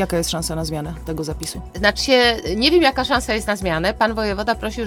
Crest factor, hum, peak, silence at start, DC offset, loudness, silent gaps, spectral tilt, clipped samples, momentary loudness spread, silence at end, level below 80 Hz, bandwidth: 20 dB; none; 0 dBFS; 0 s; under 0.1%; -19 LUFS; none; -4 dB/octave; under 0.1%; 12 LU; 0 s; -34 dBFS; 19 kHz